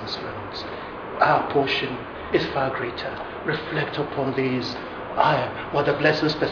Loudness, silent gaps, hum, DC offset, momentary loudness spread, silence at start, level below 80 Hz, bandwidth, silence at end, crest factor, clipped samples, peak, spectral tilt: -24 LUFS; none; none; under 0.1%; 12 LU; 0 s; -50 dBFS; 5.4 kHz; 0 s; 20 dB; under 0.1%; -4 dBFS; -6.5 dB/octave